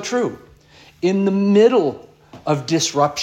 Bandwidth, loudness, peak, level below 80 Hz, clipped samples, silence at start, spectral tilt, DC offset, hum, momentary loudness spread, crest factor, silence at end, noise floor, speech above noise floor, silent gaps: 13 kHz; -18 LUFS; -2 dBFS; -58 dBFS; under 0.1%; 0 s; -5 dB/octave; under 0.1%; none; 12 LU; 16 dB; 0 s; -48 dBFS; 31 dB; none